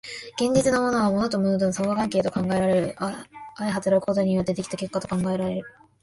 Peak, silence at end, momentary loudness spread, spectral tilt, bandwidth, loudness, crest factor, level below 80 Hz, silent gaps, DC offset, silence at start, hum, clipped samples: -8 dBFS; 0.35 s; 10 LU; -6 dB/octave; 11.5 kHz; -24 LUFS; 16 dB; -54 dBFS; none; under 0.1%; 0.05 s; none; under 0.1%